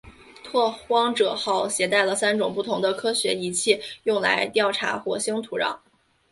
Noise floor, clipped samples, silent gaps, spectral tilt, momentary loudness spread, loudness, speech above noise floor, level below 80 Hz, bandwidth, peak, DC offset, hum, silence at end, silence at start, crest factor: -44 dBFS; under 0.1%; none; -2.5 dB/octave; 6 LU; -23 LUFS; 21 dB; -64 dBFS; 12 kHz; -4 dBFS; under 0.1%; none; 0.55 s; 0.05 s; 20 dB